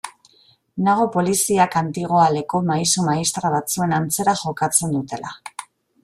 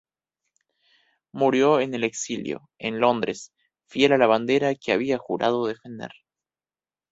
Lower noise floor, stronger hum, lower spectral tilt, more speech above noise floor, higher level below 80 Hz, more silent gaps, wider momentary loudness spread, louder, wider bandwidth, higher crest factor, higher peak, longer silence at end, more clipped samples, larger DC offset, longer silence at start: second, -56 dBFS vs under -90 dBFS; second, none vs 50 Hz at -60 dBFS; about the same, -4 dB/octave vs -4.5 dB/octave; second, 37 dB vs over 67 dB; first, -58 dBFS vs -66 dBFS; neither; about the same, 15 LU vs 17 LU; first, -19 LUFS vs -23 LUFS; first, 15.5 kHz vs 8 kHz; about the same, 20 dB vs 20 dB; about the same, -2 dBFS vs -4 dBFS; second, 0.4 s vs 1.05 s; neither; neither; second, 0.05 s vs 1.35 s